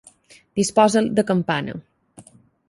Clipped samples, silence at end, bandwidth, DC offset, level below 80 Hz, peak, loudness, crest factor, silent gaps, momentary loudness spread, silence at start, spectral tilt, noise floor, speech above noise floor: under 0.1%; 0.45 s; 11.5 kHz; under 0.1%; -58 dBFS; -2 dBFS; -20 LUFS; 20 dB; none; 15 LU; 0.55 s; -5 dB/octave; -51 dBFS; 32 dB